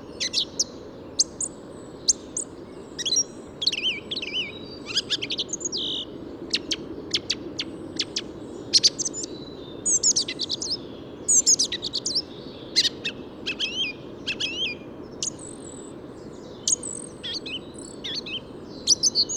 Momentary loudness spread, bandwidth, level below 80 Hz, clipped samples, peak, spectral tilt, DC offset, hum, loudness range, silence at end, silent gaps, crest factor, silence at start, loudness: 20 LU; 18 kHz; -56 dBFS; under 0.1%; -6 dBFS; -0.5 dB/octave; under 0.1%; none; 8 LU; 0 s; none; 22 dB; 0 s; -24 LUFS